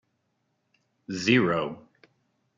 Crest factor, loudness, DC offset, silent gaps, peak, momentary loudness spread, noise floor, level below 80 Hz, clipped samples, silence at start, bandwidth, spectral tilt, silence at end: 22 dB; -25 LUFS; under 0.1%; none; -8 dBFS; 16 LU; -75 dBFS; -66 dBFS; under 0.1%; 1.1 s; 7.6 kHz; -5.5 dB/octave; 0.75 s